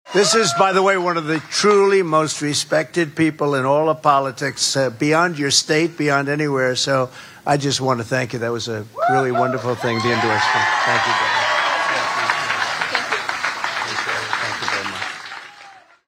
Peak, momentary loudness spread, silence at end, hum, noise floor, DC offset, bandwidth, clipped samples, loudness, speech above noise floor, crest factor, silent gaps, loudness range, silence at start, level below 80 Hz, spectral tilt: 0 dBFS; 7 LU; 0.3 s; none; -44 dBFS; under 0.1%; 16 kHz; under 0.1%; -18 LUFS; 26 dB; 18 dB; none; 3 LU; 0.05 s; -62 dBFS; -3.5 dB/octave